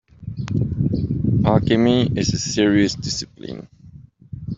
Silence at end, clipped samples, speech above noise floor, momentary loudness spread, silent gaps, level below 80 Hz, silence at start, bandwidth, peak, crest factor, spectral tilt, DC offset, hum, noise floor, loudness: 0 s; under 0.1%; 25 dB; 18 LU; none; -40 dBFS; 0.2 s; 7.8 kHz; -2 dBFS; 18 dB; -6 dB/octave; under 0.1%; none; -44 dBFS; -19 LUFS